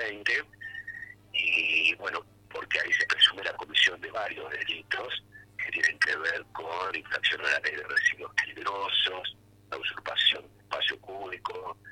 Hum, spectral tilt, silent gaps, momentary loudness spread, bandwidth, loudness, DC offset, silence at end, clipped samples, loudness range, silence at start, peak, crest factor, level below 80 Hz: 50 Hz at -60 dBFS; -1 dB/octave; none; 15 LU; 16.5 kHz; -27 LUFS; under 0.1%; 0 s; under 0.1%; 4 LU; 0 s; -8 dBFS; 22 dB; -68 dBFS